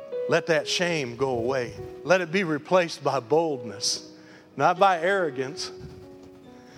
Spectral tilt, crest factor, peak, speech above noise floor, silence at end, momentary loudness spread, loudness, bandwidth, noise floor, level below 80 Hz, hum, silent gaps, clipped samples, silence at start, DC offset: -4 dB/octave; 20 dB; -6 dBFS; 23 dB; 0 s; 14 LU; -25 LUFS; 15 kHz; -47 dBFS; -62 dBFS; none; none; under 0.1%; 0 s; under 0.1%